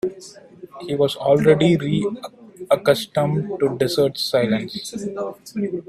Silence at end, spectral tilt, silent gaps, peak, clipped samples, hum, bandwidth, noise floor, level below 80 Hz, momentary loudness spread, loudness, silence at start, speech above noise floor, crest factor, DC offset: 0.05 s; -6 dB/octave; none; 0 dBFS; under 0.1%; none; 15.5 kHz; -43 dBFS; -56 dBFS; 14 LU; -20 LUFS; 0.05 s; 23 dB; 20 dB; under 0.1%